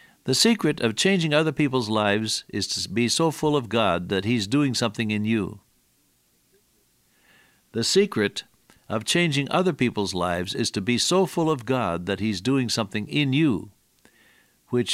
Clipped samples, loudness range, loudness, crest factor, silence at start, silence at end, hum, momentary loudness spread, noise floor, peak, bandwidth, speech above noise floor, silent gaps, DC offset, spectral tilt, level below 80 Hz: under 0.1%; 6 LU; -23 LUFS; 18 dB; 0.25 s; 0 s; none; 6 LU; -65 dBFS; -6 dBFS; 16 kHz; 42 dB; none; under 0.1%; -4.5 dB/octave; -58 dBFS